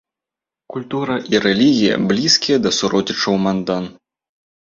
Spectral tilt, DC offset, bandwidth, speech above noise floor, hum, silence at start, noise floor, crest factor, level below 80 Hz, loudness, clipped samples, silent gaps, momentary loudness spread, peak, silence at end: -4 dB/octave; under 0.1%; 7.8 kHz; 70 dB; none; 0.7 s; -87 dBFS; 18 dB; -54 dBFS; -16 LUFS; under 0.1%; none; 11 LU; 0 dBFS; 0.85 s